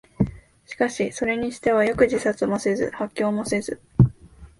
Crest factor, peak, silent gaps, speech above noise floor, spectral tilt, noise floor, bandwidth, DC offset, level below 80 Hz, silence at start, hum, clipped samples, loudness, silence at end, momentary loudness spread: 20 dB; -4 dBFS; none; 23 dB; -6.5 dB/octave; -46 dBFS; 11.5 kHz; under 0.1%; -44 dBFS; 0.2 s; none; under 0.1%; -23 LUFS; 0.15 s; 7 LU